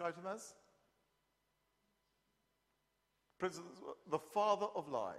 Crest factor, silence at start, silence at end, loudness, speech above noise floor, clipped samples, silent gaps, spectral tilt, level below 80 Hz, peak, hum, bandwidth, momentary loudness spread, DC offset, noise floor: 22 dB; 0 s; 0 s; -41 LUFS; 42 dB; under 0.1%; none; -4.5 dB/octave; -86 dBFS; -22 dBFS; none; 14 kHz; 16 LU; under 0.1%; -83 dBFS